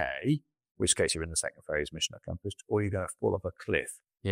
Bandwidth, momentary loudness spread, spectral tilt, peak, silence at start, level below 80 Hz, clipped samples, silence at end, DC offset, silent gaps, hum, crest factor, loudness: 16 kHz; 12 LU; -3.5 dB/octave; -10 dBFS; 0 s; -52 dBFS; under 0.1%; 0 s; under 0.1%; 0.71-0.75 s; none; 22 dB; -31 LUFS